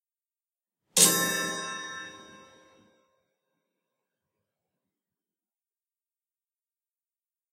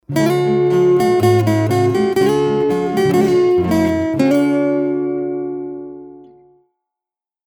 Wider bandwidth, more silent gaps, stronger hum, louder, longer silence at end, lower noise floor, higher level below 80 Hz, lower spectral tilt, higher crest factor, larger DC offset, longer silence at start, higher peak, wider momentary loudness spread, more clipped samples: second, 16 kHz vs 19.5 kHz; neither; neither; second, -23 LUFS vs -15 LUFS; first, 5.15 s vs 1.3 s; about the same, under -90 dBFS vs -88 dBFS; second, -76 dBFS vs -50 dBFS; second, -1 dB/octave vs -7 dB/octave; first, 30 dB vs 14 dB; neither; first, 0.95 s vs 0.1 s; about the same, -4 dBFS vs -2 dBFS; first, 20 LU vs 10 LU; neither